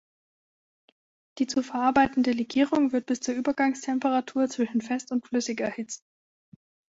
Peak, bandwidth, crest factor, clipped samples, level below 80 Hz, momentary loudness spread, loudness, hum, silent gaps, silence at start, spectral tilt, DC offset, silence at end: -10 dBFS; 8 kHz; 18 dB; under 0.1%; -64 dBFS; 8 LU; -26 LUFS; none; none; 1.35 s; -4 dB/octave; under 0.1%; 0.95 s